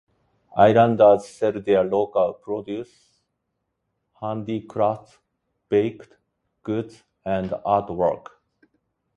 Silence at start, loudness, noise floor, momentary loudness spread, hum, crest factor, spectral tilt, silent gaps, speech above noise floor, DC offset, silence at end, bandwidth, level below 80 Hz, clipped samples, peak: 0.55 s; -22 LUFS; -77 dBFS; 18 LU; none; 20 dB; -7.5 dB/octave; none; 56 dB; under 0.1%; 1 s; 11.5 kHz; -56 dBFS; under 0.1%; -2 dBFS